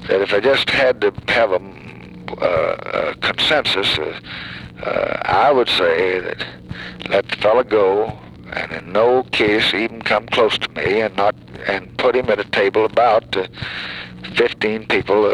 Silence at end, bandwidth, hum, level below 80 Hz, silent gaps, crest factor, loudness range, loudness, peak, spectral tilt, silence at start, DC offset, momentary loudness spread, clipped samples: 0 s; 12.5 kHz; none; -46 dBFS; none; 16 dB; 2 LU; -17 LUFS; -2 dBFS; -4.5 dB/octave; 0 s; under 0.1%; 14 LU; under 0.1%